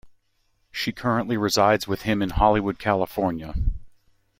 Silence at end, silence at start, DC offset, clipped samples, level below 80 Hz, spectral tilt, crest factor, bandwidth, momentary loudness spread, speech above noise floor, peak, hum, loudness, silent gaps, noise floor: 0.5 s; 0.05 s; under 0.1%; under 0.1%; -36 dBFS; -5 dB/octave; 20 dB; 16.5 kHz; 10 LU; 45 dB; -4 dBFS; none; -23 LUFS; none; -68 dBFS